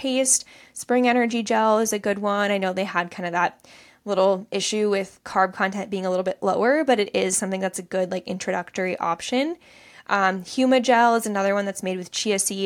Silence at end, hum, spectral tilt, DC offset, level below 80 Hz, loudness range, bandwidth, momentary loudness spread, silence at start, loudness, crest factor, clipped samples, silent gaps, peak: 0 s; none; -3.5 dB/octave; under 0.1%; -68 dBFS; 2 LU; 17 kHz; 8 LU; 0 s; -22 LUFS; 18 dB; under 0.1%; none; -6 dBFS